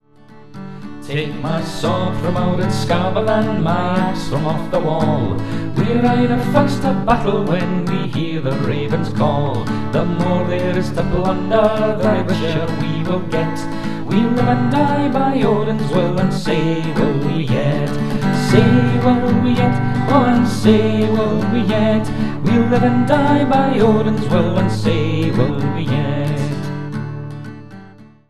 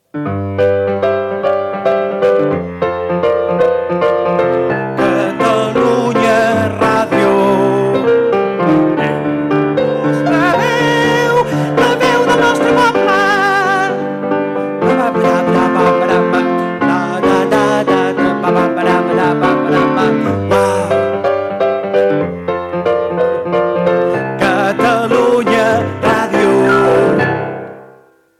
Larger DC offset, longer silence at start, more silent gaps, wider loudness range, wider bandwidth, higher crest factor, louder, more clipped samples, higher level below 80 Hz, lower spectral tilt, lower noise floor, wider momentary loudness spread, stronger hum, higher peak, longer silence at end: first, 5% vs under 0.1%; second, 0 s vs 0.15 s; neither; about the same, 4 LU vs 3 LU; second, 13.5 kHz vs 15 kHz; first, 16 dB vs 10 dB; second, -17 LUFS vs -13 LUFS; neither; first, -36 dBFS vs -48 dBFS; first, -7.5 dB/octave vs -6 dB/octave; about the same, -43 dBFS vs -45 dBFS; first, 8 LU vs 5 LU; neither; about the same, 0 dBFS vs -2 dBFS; second, 0 s vs 0.55 s